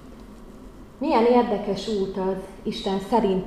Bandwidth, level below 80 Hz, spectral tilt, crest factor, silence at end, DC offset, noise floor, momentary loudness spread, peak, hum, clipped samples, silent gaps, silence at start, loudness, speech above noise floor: 13 kHz; -46 dBFS; -6.5 dB/octave; 16 dB; 0 s; 0.1%; -43 dBFS; 26 LU; -8 dBFS; none; under 0.1%; none; 0 s; -24 LUFS; 20 dB